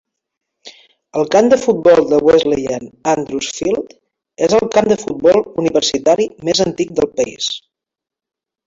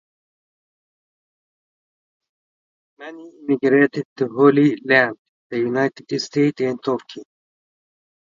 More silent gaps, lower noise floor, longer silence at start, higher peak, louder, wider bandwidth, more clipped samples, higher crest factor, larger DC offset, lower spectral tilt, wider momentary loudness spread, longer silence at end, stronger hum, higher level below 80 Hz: second, none vs 4.05-4.16 s, 5.19-5.50 s; second, -86 dBFS vs under -90 dBFS; second, 0.65 s vs 3 s; about the same, 0 dBFS vs 0 dBFS; first, -15 LUFS vs -19 LUFS; about the same, 7.8 kHz vs 7.6 kHz; neither; second, 14 dB vs 22 dB; neither; second, -4 dB/octave vs -6.5 dB/octave; second, 10 LU vs 22 LU; about the same, 1.1 s vs 1.15 s; neither; first, -50 dBFS vs -72 dBFS